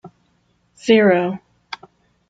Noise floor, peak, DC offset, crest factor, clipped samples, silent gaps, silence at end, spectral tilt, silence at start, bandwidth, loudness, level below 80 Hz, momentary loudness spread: -63 dBFS; -2 dBFS; under 0.1%; 18 dB; under 0.1%; none; 0.55 s; -6 dB/octave; 0.05 s; 9 kHz; -16 LUFS; -64 dBFS; 22 LU